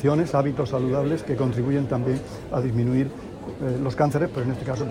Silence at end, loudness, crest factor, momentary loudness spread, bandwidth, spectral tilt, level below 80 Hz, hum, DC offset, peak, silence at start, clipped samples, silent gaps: 0 s; -24 LUFS; 16 dB; 7 LU; 11.5 kHz; -8.5 dB/octave; -48 dBFS; none; under 0.1%; -8 dBFS; 0 s; under 0.1%; none